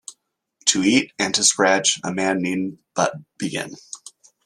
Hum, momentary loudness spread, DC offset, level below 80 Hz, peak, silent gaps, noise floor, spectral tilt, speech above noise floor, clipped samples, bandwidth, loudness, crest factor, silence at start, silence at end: none; 18 LU; under 0.1%; -64 dBFS; -2 dBFS; none; -62 dBFS; -2.5 dB/octave; 41 dB; under 0.1%; 13.5 kHz; -20 LUFS; 20 dB; 0.1 s; 0.35 s